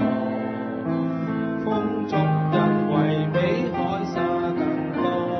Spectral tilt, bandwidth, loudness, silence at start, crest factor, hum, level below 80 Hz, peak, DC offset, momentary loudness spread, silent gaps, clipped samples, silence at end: -8.5 dB/octave; 6.2 kHz; -24 LUFS; 0 s; 16 dB; none; -58 dBFS; -6 dBFS; under 0.1%; 6 LU; none; under 0.1%; 0 s